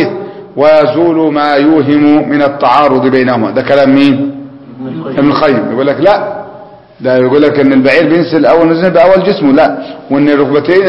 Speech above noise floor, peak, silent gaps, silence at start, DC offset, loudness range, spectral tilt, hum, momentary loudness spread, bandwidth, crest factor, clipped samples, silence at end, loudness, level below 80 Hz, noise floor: 25 dB; 0 dBFS; none; 0 s; 0.6%; 3 LU; -8 dB/octave; none; 12 LU; 5.8 kHz; 8 dB; 0.7%; 0 s; -8 LUFS; -46 dBFS; -32 dBFS